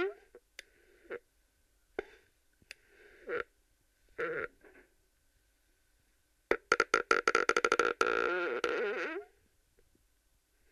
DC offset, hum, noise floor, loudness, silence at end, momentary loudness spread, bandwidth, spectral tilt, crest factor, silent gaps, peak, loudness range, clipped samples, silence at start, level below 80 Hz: under 0.1%; none; -73 dBFS; -32 LUFS; 1.45 s; 25 LU; 14.5 kHz; -2 dB/octave; 28 dB; none; -10 dBFS; 16 LU; under 0.1%; 0 s; -68 dBFS